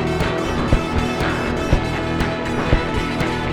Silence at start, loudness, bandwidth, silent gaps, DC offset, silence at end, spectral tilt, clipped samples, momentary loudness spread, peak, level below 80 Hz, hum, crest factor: 0 s; -20 LUFS; 16 kHz; none; under 0.1%; 0 s; -6 dB/octave; under 0.1%; 2 LU; 0 dBFS; -26 dBFS; none; 18 dB